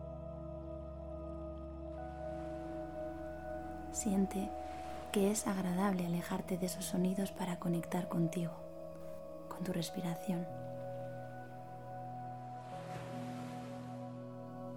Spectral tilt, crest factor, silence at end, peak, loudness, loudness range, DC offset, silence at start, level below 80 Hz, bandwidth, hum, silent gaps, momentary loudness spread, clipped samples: -6 dB/octave; 22 dB; 0 s; -18 dBFS; -41 LUFS; 9 LU; under 0.1%; 0 s; -56 dBFS; 17.5 kHz; none; none; 13 LU; under 0.1%